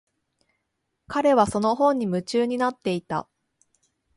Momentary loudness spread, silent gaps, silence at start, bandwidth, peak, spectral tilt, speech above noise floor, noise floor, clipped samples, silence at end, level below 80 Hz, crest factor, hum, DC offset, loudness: 10 LU; none; 1.1 s; 11.5 kHz; -6 dBFS; -6 dB/octave; 55 dB; -78 dBFS; under 0.1%; 0.95 s; -58 dBFS; 20 dB; none; under 0.1%; -23 LUFS